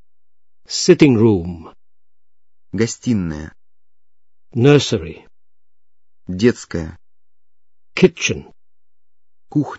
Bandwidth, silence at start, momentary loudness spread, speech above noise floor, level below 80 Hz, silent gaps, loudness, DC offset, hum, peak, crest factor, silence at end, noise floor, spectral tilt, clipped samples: 8 kHz; 0.7 s; 19 LU; over 74 dB; -46 dBFS; none; -17 LUFS; under 0.1%; none; 0 dBFS; 20 dB; 0.05 s; under -90 dBFS; -5.5 dB/octave; under 0.1%